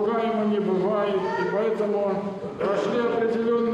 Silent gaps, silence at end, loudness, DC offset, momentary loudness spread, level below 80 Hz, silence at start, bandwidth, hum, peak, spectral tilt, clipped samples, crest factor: none; 0 s; -24 LUFS; under 0.1%; 3 LU; -64 dBFS; 0 s; 9.4 kHz; none; -14 dBFS; -7 dB/octave; under 0.1%; 10 dB